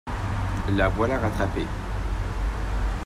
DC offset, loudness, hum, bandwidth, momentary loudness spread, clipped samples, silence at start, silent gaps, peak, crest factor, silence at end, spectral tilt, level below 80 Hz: under 0.1%; -27 LUFS; none; 13 kHz; 7 LU; under 0.1%; 0.05 s; none; -10 dBFS; 16 dB; 0 s; -7 dB/octave; -30 dBFS